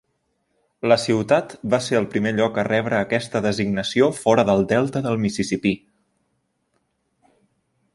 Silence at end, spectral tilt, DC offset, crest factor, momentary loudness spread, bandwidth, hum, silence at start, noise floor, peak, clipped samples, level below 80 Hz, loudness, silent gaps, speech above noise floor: 2.2 s; -5.5 dB/octave; under 0.1%; 20 dB; 5 LU; 11.5 kHz; none; 0.85 s; -71 dBFS; -2 dBFS; under 0.1%; -54 dBFS; -21 LUFS; none; 51 dB